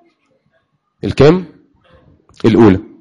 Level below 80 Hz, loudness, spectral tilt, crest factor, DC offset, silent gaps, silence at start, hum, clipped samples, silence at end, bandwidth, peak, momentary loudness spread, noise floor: -38 dBFS; -11 LUFS; -8 dB/octave; 14 dB; under 0.1%; none; 1.05 s; none; under 0.1%; 0.2 s; 9.6 kHz; 0 dBFS; 12 LU; -62 dBFS